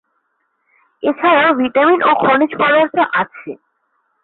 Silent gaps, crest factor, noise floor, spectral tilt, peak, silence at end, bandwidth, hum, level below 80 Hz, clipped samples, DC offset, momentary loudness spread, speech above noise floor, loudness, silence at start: none; 14 dB; -67 dBFS; -9.5 dB/octave; -2 dBFS; 0.7 s; 4.3 kHz; none; -62 dBFS; under 0.1%; under 0.1%; 11 LU; 53 dB; -13 LUFS; 1.05 s